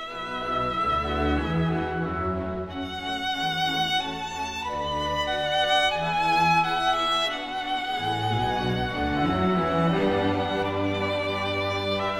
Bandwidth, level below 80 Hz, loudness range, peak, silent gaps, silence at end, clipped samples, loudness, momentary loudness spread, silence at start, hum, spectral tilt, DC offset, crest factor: 16 kHz; -42 dBFS; 4 LU; -12 dBFS; none; 0 s; under 0.1%; -25 LUFS; 8 LU; 0 s; none; -5 dB/octave; under 0.1%; 14 dB